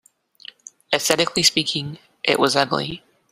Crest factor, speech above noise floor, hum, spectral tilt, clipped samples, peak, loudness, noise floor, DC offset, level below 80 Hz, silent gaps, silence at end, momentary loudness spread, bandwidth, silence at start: 22 dB; 25 dB; none; -2.5 dB/octave; under 0.1%; -2 dBFS; -19 LUFS; -45 dBFS; under 0.1%; -58 dBFS; none; 0.35 s; 19 LU; 15.5 kHz; 0.9 s